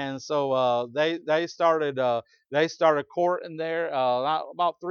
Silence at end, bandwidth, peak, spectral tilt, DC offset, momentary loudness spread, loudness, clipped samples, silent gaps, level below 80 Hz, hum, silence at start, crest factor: 0 s; 7 kHz; -8 dBFS; -5 dB/octave; under 0.1%; 6 LU; -25 LUFS; under 0.1%; none; -78 dBFS; none; 0 s; 18 dB